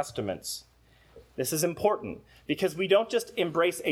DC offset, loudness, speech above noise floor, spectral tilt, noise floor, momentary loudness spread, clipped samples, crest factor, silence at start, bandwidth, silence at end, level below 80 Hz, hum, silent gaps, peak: under 0.1%; -29 LUFS; 27 dB; -4 dB/octave; -56 dBFS; 14 LU; under 0.1%; 20 dB; 0 s; 18.5 kHz; 0 s; -62 dBFS; none; none; -10 dBFS